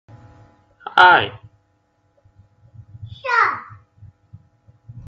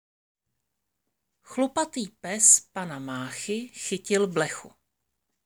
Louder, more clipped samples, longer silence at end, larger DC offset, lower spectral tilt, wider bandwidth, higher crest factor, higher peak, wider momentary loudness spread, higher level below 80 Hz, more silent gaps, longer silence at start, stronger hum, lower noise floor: first, -15 LUFS vs -24 LUFS; neither; second, 0.05 s vs 0.8 s; neither; first, -4.5 dB/octave vs -2.5 dB/octave; second, 8.2 kHz vs over 20 kHz; about the same, 22 dB vs 24 dB; first, 0 dBFS vs -4 dBFS; first, 27 LU vs 18 LU; first, -58 dBFS vs -72 dBFS; neither; second, 0.85 s vs 1.5 s; neither; second, -64 dBFS vs -82 dBFS